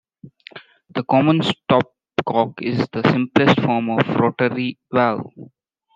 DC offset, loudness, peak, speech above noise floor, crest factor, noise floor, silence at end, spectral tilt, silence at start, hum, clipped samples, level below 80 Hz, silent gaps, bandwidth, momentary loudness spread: under 0.1%; -19 LUFS; -2 dBFS; 35 dB; 18 dB; -53 dBFS; 0.5 s; -7.5 dB/octave; 0.25 s; none; under 0.1%; -60 dBFS; none; 9.2 kHz; 11 LU